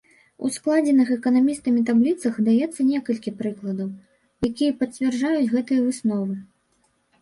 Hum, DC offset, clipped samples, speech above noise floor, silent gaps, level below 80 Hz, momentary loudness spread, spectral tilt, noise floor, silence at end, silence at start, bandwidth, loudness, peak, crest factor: none; under 0.1%; under 0.1%; 45 dB; none; -60 dBFS; 10 LU; -6 dB/octave; -67 dBFS; 0.8 s; 0.4 s; 11.5 kHz; -22 LUFS; -8 dBFS; 14 dB